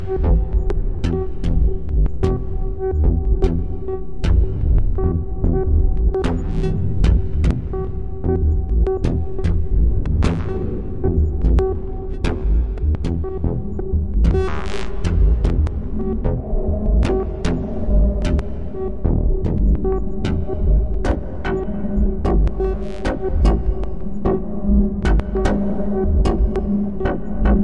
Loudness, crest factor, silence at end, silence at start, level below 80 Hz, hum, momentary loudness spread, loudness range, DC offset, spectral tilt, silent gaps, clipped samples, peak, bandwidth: -21 LUFS; 14 dB; 0 s; 0 s; -20 dBFS; none; 6 LU; 1 LU; 3%; -8.5 dB/octave; none; under 0.1%; -2 dBFS; 7.6 kHz